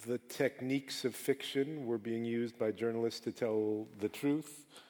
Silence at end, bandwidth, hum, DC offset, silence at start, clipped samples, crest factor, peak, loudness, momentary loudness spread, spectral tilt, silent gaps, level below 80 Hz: 0.05 s; over 20 kHz; none; under 0.1%; 0 s; under 0.1%; 18 dB; -20 dBFS; -37 LUFS; 4 LU; -5 dB/octave; none; -84 dBFS